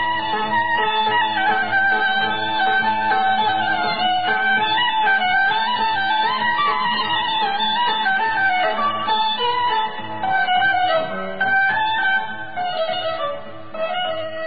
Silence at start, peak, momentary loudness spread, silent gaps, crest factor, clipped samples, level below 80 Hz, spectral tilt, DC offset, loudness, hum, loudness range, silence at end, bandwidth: 0 s; -8 dBFS; 7 LU; none; 12 dB; under 0.1%; -58 dBFS; -7.5 dB/octave; 2%; -19 LUFS; none; 2 LU; 0 s; 5 kHz